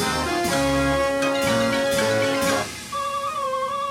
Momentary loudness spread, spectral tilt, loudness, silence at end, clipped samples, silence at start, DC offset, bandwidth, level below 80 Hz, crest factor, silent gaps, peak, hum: 5 LU; -4 dB/octave; -22 LUFS; 0 s; under 0.1%; 0 s; under 0.1%; 16 kHz; -42 dBFS; 14 dB; none; -10 dBFS; none